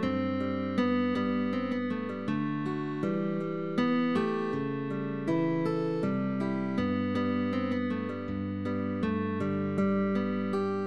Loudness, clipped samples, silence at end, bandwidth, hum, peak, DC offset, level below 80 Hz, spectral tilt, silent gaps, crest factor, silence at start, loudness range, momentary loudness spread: -31 LUFS; under 0.1%; 0 s; 8.4 kHz; none; -16 dBFS; 0.2%; -64 dBFS; -8.5 dB/octave; none; 14 dB; 0 s; 1 LU; 5 LU